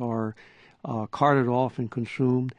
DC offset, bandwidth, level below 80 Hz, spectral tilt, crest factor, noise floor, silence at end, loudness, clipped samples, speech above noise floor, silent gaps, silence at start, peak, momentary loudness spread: under 0.1%; 9.6 kHz; -64 dBFS; -8.5 dB/octave; 20 dB; -54 dBFS; 0.05 s; -26 LUFS; under 0.1%; 29 dB; none; 0 s; -8 dBFS; 12 LU